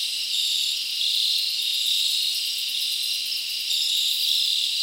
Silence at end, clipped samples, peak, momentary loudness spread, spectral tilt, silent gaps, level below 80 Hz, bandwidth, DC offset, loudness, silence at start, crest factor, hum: 0 s; under 0.1%; -10 dBFS; 4 LU; 5 dB/octave; none; -76 dBFS; 17 kHz; under 0.1%; -21 LUFS; 0 s; 16 dB; none